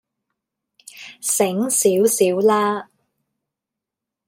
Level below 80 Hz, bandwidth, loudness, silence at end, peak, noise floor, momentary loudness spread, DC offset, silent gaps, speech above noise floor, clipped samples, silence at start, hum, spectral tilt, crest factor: -72 dBFS; 16.5 kHz; -18 LUFS; 1.45 s; -4 dBFS; -85 dBFS; 13 LU; under 0.1%; none; 67 dB; under 0.1%; 0.95 s; none; -3.5 dB/octave; 18 dB